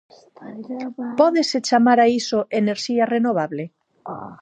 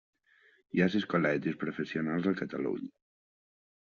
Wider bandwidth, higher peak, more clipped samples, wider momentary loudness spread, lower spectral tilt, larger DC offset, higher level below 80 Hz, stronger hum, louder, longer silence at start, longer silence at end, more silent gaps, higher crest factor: first, 9.2 kHz vs 7 kHz; first, -2 dBFS vs -14 dBFS; neither; first, 20 LU vs 7 LU; about the same, -4.5 dB/octave vs -5.5 dB/octave; neither; about the same, -70 dBFS vs -72 dBFS; neither; first, -19 LUFS vs -32 LUFS; second, 0.4 s vs 0.75 s; second, 0.05 s vs 0.95 s; neither; about the same, 18 dB vs 20 dB